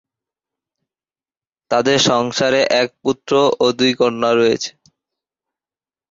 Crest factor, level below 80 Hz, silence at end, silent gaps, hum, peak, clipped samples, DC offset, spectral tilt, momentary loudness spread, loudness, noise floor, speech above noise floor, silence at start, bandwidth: 16 dB; -58 dBFS; 1.4 s; none; none; -2 dBFS; under 0.1%; under 0.1%; -3.5 dB/octave; 6 LU; -16 LUFS; under -90 dBFS; over 74 dB; 1.7 s; 7.8 kHz